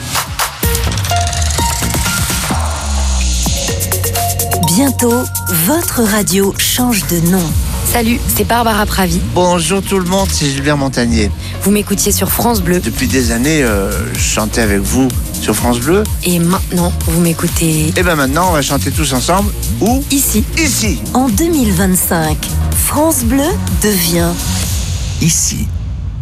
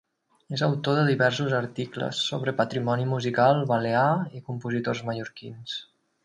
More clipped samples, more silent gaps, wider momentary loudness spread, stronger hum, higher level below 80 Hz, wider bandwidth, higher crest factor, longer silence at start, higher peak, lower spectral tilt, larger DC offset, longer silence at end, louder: neither; neither; second, 4 LU vs 13 LU; neither; first, -22 dBFS vs -66 dBFS; first, 15.5 kHz vs 10.5 kHz; second, 12 dB vs 18 dB; second, 0 s vs 0.5 s; first, 0 dBFS vs -8 dBFS; second, -4 dB/octave vs -6 dB/octave; neither; second, 0 s vs 0.4 s; first, -13 LUFS vs -26 LUFS